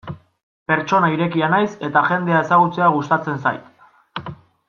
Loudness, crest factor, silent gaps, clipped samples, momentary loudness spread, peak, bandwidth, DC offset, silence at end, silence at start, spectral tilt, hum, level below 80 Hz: -18 LUFS; 18 dB; 0.43-0.66 s; under 0.1%; 18 LU; -2 dBFS; 7.2 kHz; under 0.1%; 0.35 s; 0.05 s; -7 dB/octave; none; -62 dBFS